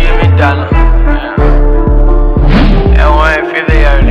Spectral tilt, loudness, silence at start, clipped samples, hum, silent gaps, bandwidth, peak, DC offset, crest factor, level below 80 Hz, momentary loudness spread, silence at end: -8 dB/octave; -9 LUFS; 0 s; 1%; none; none; 5.8 kHz; 0 dBFS; under 0.1%; 6 dB; -8 dBFS; 3 LU; 0 s